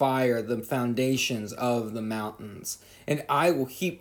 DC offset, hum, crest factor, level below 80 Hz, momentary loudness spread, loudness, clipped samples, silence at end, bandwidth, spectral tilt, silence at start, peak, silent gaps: under 0.1%; none; 16 dB; -66 dBFS; 12 LU; -28 LUFS; under 0.1%; 0 s; over 20 kHz; -5 dB/octave; 0 s; -10 dBFS; none